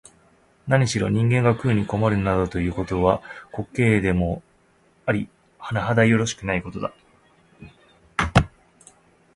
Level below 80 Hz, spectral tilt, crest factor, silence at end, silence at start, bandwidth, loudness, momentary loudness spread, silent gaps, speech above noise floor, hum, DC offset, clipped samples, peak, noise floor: -40 dBFS; -6.5 dB/octave; 22 dB; 0.9 s; 0.65 s; 11.5 kHz; -22 LUFS; 14 LU; none; 38 dB; none; under 0.1%; under 0.1%; 0 dBFS; -59 dBFS